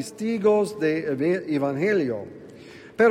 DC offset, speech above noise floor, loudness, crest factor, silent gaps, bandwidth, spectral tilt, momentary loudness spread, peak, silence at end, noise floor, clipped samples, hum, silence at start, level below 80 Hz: under 0.1%; 21 dB; -24 LUFS; 16 dB; none; 15 kHz; -6.5 dB/octave; 20 LU; -6 dBFS; 0 s; -44 dBFS; under 0.1%; none; 0 s; -68 dBFS